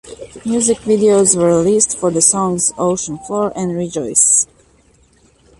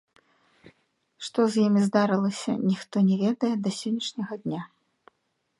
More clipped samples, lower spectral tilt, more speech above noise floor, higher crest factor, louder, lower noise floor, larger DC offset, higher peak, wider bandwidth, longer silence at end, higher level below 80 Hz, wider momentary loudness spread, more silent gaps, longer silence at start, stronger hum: neither; second, -4 dB/octave vs -6 dB/octave; second, 37 dB vs 51 dB; about the same, 16 dB vs 18 dB; first, -14 LUFS vs -26 LUFS; second, -52 dBFS vs -75 dBFS; neither; first, 0 dBFS vs -8 dBFS; about the same, 11.5 kHz vs 11.5 kHz; first, 1.15 s vs 0.95 s; first, -50 dBFS vs -74 dBFS; about the same, 11 LU vs 11 LU; neither; second, 0.05 s vs 0.65 s; neither